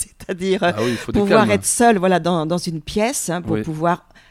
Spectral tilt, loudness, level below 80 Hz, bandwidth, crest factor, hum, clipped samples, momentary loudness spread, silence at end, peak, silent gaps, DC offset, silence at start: -4.5 dB/octave; -18 LUFS; -44 dBFS; 16 kHz; 18 dB; none; under 0.1%; 9 LU; 0.35 s; 0 dBFS; none; under 0.1%; 0 s